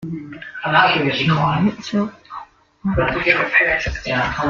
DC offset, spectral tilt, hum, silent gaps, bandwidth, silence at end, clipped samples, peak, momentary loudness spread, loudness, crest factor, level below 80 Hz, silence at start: under 0.1%; -6 dB/octave; none; none; 7.2 kHz; 0 s; under 0.1%; -2 dBFS; 17 LU; -17 LUFS; 18 dB; -38 dBFS; 0 s